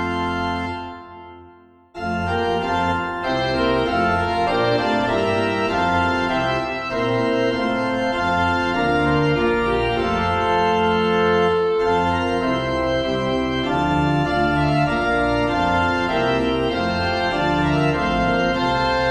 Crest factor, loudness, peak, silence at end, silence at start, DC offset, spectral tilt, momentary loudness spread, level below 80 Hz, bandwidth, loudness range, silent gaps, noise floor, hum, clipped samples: 14 dB; -20 LUFS; -6 dBFS; 0 s; 0 s; under 0.1%; -6.5 dB/octave; 5 LU; -38 dBFS; 11 kHz; 2 LU; none; -48 dBFS; none; under 0.1%